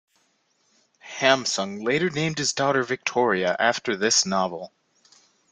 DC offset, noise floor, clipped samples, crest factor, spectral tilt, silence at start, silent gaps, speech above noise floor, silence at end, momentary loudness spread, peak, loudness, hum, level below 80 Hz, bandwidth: under 0.1%; -68 dBFS; under 0.1%; 24 dB; -3 dB/octave; 1.05 s; none; 44 dB; 0.85 s; 7 LU; -2 dBFS; -23 LUFS; none; -66 dBFS; 11 kHz